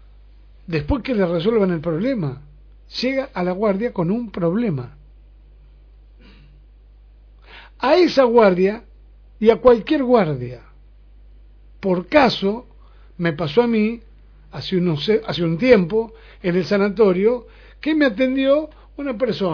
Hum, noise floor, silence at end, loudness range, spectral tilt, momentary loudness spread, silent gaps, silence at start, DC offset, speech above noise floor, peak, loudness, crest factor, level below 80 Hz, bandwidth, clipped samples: 50 Hz at -45 dBFS; -46 dBFS; 0 s; 7 LU; -7.5 dB/octave; 14 LU; none; 0.7 s; under 0.1%; 28 dB; 0 dBFS; -19 LUFS; 20 dB; -44 dBFS; 5.4 kHz; under 0.1%